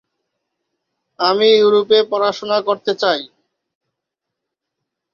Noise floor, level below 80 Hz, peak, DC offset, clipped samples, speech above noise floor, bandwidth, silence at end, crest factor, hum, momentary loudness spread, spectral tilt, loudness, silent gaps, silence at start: -80 dBFS; -68 dBFS; -2 dBFS; under 0.1%; under 0.1%; 66 dB; 7 kHz; 1.9 s; 18 dB; none; 8 LU; -4 dB/octave; -15 LUFS; none; 1.2 s